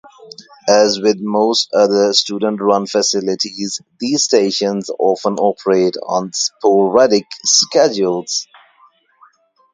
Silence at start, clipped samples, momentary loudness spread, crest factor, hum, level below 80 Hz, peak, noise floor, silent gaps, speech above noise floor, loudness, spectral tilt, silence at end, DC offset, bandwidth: 0.2 s; under 0.1%; 8 LU; 16 dB; none; -64 dBFS; 0 dBFS; -52 dBFS; none; 37 dB; -15 LUFS; -3 dB/octave; 1.3 s; under 0.1%; 10 kHz